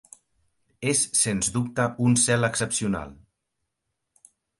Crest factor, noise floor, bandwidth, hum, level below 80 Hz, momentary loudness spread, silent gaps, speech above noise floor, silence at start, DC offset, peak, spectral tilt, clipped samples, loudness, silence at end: 18 dB; -81 dBFS; 11.5 kHz; none; -54 dBFS; 10 LU; none; 57 dB; 0.8 s; under 0.1%; -8 dBFS; -3.5 dB/octave; under 0.1%; -23 LUFS; 1.45 s